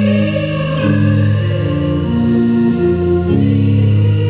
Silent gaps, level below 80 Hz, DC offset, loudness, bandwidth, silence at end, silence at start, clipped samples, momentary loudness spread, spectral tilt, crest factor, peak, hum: none; -30 dBFS; 0.4%; -14 LUFS; 4 kHz; 0 s; 0 s; under 0.1%; 4 LU; -12.5 dB/octave; 10 dB; -2 dBFS; none